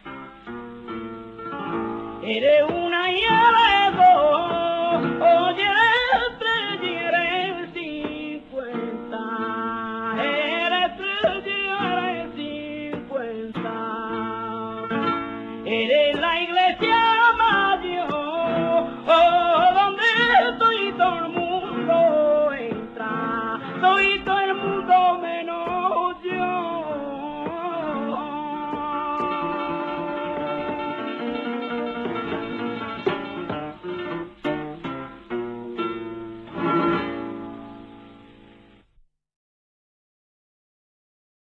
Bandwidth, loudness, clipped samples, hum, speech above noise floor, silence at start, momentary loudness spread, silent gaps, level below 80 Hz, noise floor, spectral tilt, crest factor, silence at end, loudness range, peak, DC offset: 7.8 kHz; -22 LUFS; under 0.1%; none; 42 dB; 0.05 s; 15 LU; none; -54 dBFS; -60 dBFS; -5.5 dB/octave; 18 dB; 3.3 s; 11 LU; -4 dBFS; under 0.1%